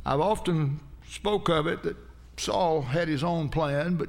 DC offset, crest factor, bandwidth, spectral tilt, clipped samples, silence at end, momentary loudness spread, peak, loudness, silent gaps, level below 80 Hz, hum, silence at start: under 0.1%; 16 dB; 15.5 kHz; -6 dB/octave; under 0.1%; 0 s; 11 LU; -12 dBFS; -27 LUFS; none; -46 dBFS; none; 0 s